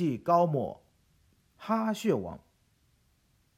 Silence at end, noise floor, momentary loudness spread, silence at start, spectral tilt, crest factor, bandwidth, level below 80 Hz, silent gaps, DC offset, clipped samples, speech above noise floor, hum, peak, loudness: 1.2 s; -69 dBFS; 22 LU; 0 s; -7 dB/octave; 20 dB; 15.5 kHz; -66 dBFS; none; under 0.1%; under 0.1%; 41 dB; none; -10 dBFS; -29 LUFS